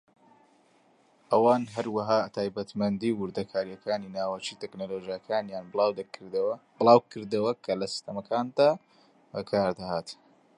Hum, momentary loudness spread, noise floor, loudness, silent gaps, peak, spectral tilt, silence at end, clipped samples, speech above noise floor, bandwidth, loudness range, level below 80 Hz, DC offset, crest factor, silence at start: none; 13 LU; -64 dBFS; -28 LUFS; none; -4 dBFS; -6 dB/octave; 0.45 s; under 0.1%; 36 dB; 11 kHz; 5 LU; -68 dBFS; under 0.1%; 24 dB; 1.3 s